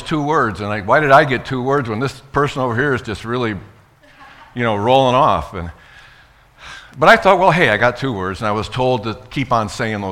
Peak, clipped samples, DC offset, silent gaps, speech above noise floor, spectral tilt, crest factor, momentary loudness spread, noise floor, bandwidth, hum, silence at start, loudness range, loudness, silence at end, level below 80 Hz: 0 dBFS; 0.1%; under 0.1%; none; 32 dB; -6 dB/octave; 16 dB; 13 LU; -47 dBFS; 16 kHz; none; 0 s; 5 LU; -16 LUFS; 0 s; -42 dBFS